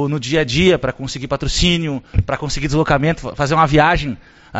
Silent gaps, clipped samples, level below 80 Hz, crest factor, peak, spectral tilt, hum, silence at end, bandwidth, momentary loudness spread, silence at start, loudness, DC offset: none; under 0.1%; -28 dBFS; 16 dB; 0 dBFS; -4 dB/octave; none; 0 s; 8 kHz; 10 LU; 0 s; -17 LUFS; under 0.1%